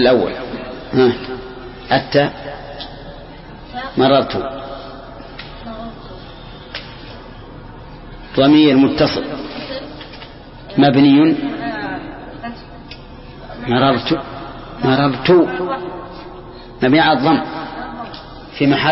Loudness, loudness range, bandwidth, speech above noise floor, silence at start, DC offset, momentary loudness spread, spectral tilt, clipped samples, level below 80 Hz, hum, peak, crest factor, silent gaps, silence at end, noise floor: -15 LUFS; 6 LU; 5.8 kHz; 22 dB; 0 s; under 0.1%; 23 LU; -10 dB/octave; under 0.1%; -40 dBFS; none; 0 dBFS; 18 dB; none; 0 s; -35 dBFS